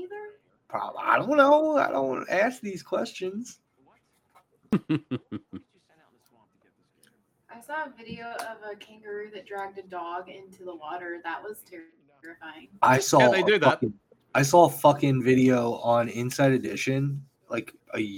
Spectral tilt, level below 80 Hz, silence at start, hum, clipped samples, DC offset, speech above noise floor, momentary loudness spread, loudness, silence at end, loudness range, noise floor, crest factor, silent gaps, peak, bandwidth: -5.5 dB/octave; -68 dBFS; 0 s; none; under 0.1%; under 0.1%; 43 dB; 22 LU; -24 LUFS; 0 s; 18 LU; -68 dBFS; 22 dB; none; -6 dBFS; 18 kHz